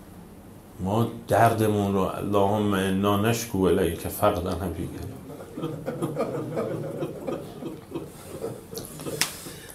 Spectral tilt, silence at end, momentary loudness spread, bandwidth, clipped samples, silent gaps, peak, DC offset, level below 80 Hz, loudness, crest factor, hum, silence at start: -5.5 dB/octave; 0 s; 15 LU; 16 kHz; under 0.1%; none; -2 dBFS; under 0.1%; -54 dBFS; -26 LUFS; 26 dB; none; 0 s